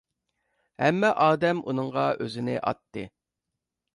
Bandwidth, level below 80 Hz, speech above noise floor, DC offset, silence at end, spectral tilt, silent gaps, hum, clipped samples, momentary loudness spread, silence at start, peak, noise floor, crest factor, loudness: 11 kHz; -66 dBFS; 60 dB; under 0.1%; 0.9 s; -6.5 dB/octave; none; none; under 0.1%; 16 LU; 0.8 s; -8 dBFS; -85 dBFS; 20 dB; -25 LUFS